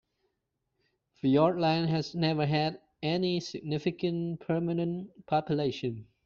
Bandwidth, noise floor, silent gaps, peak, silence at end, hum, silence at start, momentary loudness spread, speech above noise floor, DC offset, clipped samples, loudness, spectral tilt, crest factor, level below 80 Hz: 7 kHz; -82 dBFS; none; -12 dBFS; 0.25 s; none; 1.25 s; 9 LU; 53 dB; under 0.1%; under 0.1%; -30 LUFS; -5.5 dB/octave; 18 dB; -66 dBFS